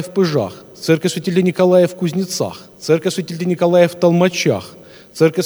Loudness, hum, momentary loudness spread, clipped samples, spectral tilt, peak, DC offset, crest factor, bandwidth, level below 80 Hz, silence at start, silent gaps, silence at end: -16 LUFS; none; 12 LU; under 0.1%; -5.5 dB/octave; 0 dBFS; under 0.1%; 16 dB; over 20 kHz; -62 dBFS; 0 s; none; 0 s